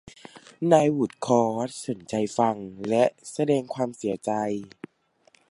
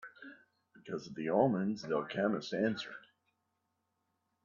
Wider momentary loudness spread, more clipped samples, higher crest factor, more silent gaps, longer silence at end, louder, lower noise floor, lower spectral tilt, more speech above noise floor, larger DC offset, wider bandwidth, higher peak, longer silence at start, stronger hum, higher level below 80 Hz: second, 12 LU vs 21 LU; neither; about the same, 22 dB vs 22 dB; neither; second, 0.85 s vs 1.45 s; first, -25 LUFS vs -35 LUFS; second, -63 dBFS vs -83 dBFS; about the same, -6 dB/octave vs -6.5 dB/octave; second, 38 dB vs 49 dB; neither; first, 11.5 kHz vs 7.4 kHz; first, -4 dBFS vs -16 dBFS; first, 0.35 s vs 0 s; neither; first, -68 dBFS vs -78 dBFS